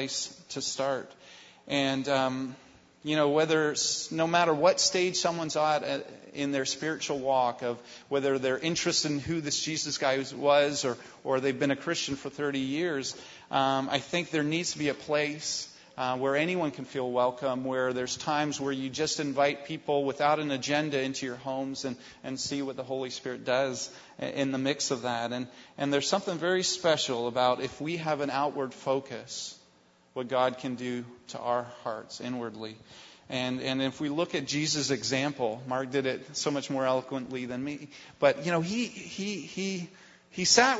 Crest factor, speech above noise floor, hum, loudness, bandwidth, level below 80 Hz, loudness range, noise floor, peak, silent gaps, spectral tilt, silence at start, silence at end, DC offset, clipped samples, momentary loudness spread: 24 dB; 33 dB; none; -30 LUFS; 8 kHz; -68 dBFS; 6 LU; -63 dBFS; -6 dBFS; none; -3.5 dB/octave; 0 s; 0 s; under 0.1%; under 0.1%; 11 LU